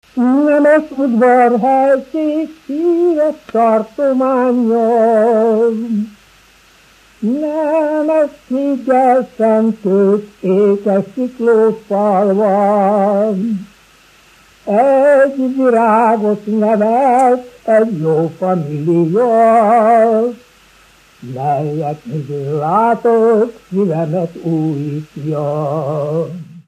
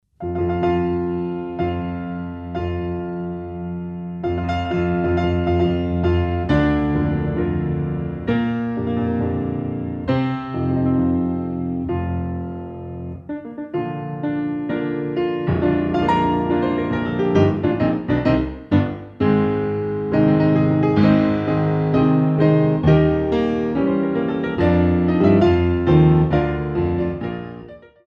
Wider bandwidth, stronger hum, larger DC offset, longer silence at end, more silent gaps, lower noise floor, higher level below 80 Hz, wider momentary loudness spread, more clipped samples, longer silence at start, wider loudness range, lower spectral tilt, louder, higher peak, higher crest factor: first, 11 kHz vs 6.2 kHz; neither; neither; second, 0.05 s vs 0.3 s; neither; first, -47 dBFS vs -39 dBFS; second, -58 dBFS vs -36 dBFS; about the same, 10 LU vs 12 LU; neither; about the same, 0.15 s vs 0.2 s; second, 4 LU vs 8 LU; about the same, -8.5 dB/octave vs -9.5 dB/octave; first, -13 LUFS vs -20 LUFS; about the same, 0 dBFS vs -2 dBFS; about the same, 14 dB vs 16 dB